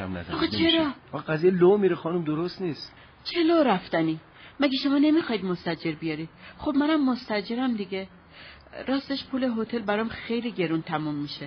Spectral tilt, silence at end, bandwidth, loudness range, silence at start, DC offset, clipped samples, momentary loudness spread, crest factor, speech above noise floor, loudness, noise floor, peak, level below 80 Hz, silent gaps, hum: -4 dB/octave; 0 s; 6.2 kHz; 5 LU; 0 s; under 0.1%; under 0.1%; 14 LU; 16 dB; 23 dB; -26 LUFS; -48 dBFS; -10 dBFS; -58 dBFS; none; none